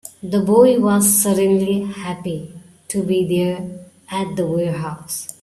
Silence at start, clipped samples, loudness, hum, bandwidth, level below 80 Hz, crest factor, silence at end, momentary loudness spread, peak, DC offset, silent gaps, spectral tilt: 0.05 s; under 0.1%; -18 LUFS; none; 15.5 kHz; -56 dBFS; 16 dB; 0.1 s; 15 LU; -2 dBFS; under 0.1%; none; -5 dB/octave